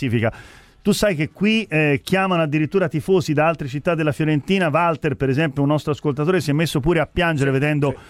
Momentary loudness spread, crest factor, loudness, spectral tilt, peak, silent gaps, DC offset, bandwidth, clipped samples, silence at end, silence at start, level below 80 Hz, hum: 3 LU; 14 dB; -19 LUFS; -6.5 dB/octave; -4 dBFS; none; under 0.1%; 15.5 kHz; under 0.1%; 0.05 s; 0 s; -44 dBFS; none